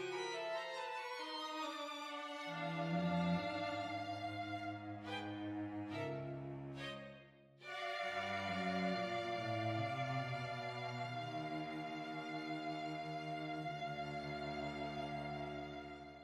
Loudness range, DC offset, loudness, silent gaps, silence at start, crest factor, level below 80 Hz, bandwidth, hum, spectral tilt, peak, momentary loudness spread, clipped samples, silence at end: 4 LU; under 0.1%; -43 LUFS; none; 0 s; 16 dB; -72 dBFS; 13 kHz; none; -6 dB/octave; -26 dBFS; 8 LU; under 0.1%; 0 s